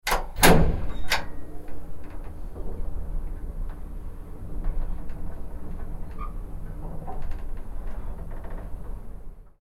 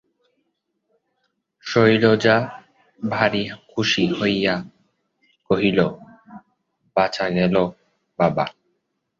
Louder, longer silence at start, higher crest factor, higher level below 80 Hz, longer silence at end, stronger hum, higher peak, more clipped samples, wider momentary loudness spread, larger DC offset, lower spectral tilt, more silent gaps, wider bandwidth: second, -30 LUFS vs -20 LUFS; second, 0.05 s vs 1.65 s; about the same, 24 dB vs 20 dB; first, -30 dBFS vs -56 dBFS; second, 0.15 s vs 0.7 s; neither; about the same, -2 dBFS vs -2 dBFS; neither; first, 17 LU vs 12 LU; neither; second, -4 dB/octave vs -6 dB/octave; neither; first, 16.5 kHz vs 7.6 kHz